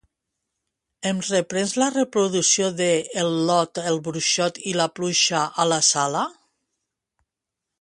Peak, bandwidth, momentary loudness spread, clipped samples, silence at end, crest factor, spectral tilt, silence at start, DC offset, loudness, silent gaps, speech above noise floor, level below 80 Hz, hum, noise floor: -4 dBFS; 11.5 kHz; 7 LU; under 0.1%; 1.5 s; 18 dB; -3 dB/octave; 1 s; under 0.1%; -21 LUFS; none; 63 dB; -68 dBFS; none; -85 dBFS